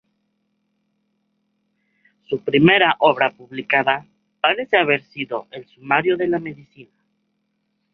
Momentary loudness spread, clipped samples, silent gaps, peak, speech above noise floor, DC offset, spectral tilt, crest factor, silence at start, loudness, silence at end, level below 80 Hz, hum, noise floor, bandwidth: 15 LU; under 0.1%; none; -2 dBFS; 52 dB; under 0.1%; -8 dB/octave; 20 dB; 2.3 s; -18 LUFS; 1.1 s; -62 dBFS; none; -71 dBFS; 5.4 kHz